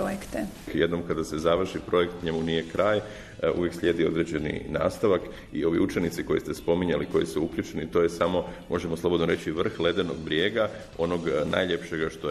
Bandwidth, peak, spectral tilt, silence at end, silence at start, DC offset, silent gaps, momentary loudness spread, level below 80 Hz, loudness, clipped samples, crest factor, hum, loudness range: 13 kHz; -8 dBFS; -6 dB/octave; 0 s; 0 s; under 0.1%; none; 6 LU; -48 dBFS; -27 LUFS; under 0.1%; 20 dB; none; 1 LU